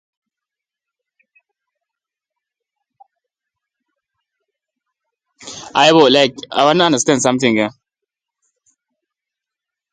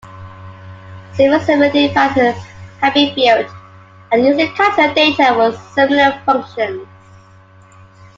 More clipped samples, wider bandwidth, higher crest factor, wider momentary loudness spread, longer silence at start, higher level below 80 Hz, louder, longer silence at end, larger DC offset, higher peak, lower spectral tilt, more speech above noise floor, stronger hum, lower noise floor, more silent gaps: neither; first, 10.5 kHz vs 7.6 kHz; first, 20 dB vs 14 dB; second, 12 LU vs 16 LU; first, 5.45 s vs 0.05 s; second, -62 dBFS vs -54 dBFS; about the same, -13 LUFS vs -13 LUFS; first, 2.25 s vs 1.35 s; neither; about the same, 0 dBFS vs 0 dBFS; second, -3.5 dB/octave vs -5 dB/octave; first, 73 dB vs 30 dB; neither; first, -86 dBFS vs -43 dBFS; neither